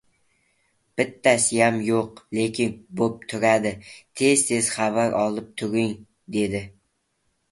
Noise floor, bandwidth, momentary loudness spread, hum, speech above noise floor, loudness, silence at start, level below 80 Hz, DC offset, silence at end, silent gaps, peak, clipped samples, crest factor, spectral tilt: -72 dBFS; 12 kHz; 11 LU; none; 49 dB; -23 LUFS; 0.95 s; -58 dBFS; under 0.1%; 0.8 s; none; -2 dBFS; under 0.1%; 22 dB; -4 dB/octave